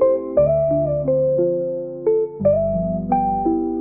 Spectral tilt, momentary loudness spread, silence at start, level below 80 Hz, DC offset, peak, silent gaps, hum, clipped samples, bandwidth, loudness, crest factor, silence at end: -13 dB/octave; 5 LU; 0 s; -42 dBFS; 0.2%; -6 dBFS; none; none; under 0.1%; 2.5 kHz; -19 LUFS; 12 dB; 0 s